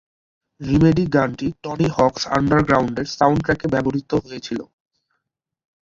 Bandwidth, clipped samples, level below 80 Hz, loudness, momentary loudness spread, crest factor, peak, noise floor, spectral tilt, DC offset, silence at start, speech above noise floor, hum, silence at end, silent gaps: 7.6 kHz; under 0.1%; -44 dBFS; -19 LUFS; 12 LU; 18 dB; -2 dBFS; -78 dBFS; -6.5 dB/octave; under 0.1%; 0.6 s; 60 dB; none; 1.3 s; none